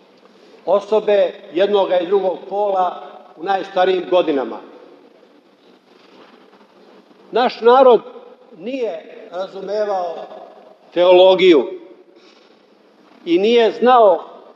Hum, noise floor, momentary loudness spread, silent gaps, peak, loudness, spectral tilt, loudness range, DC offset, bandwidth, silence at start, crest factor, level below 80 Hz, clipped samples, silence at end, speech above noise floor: none; -51 dBFS; 19 LU; none; 0 dBFS; -15 LUFS; -6 dB/octave; 7 LU; under 0.1%; 7.2 kHz; 0.65 s; 16 dB; -86 dBFS; under 0.1%; 0.25 s; 36 dB